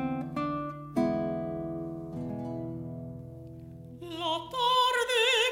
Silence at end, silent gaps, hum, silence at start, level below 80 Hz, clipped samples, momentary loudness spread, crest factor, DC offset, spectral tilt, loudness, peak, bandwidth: 0 s; none; none; 0 s; -58 dBFS; under 0.1%; 20 LU; 18 dB; under 0.1%; -4 dB/octave; -30 LUFS; -14 dBFS; 16 kHz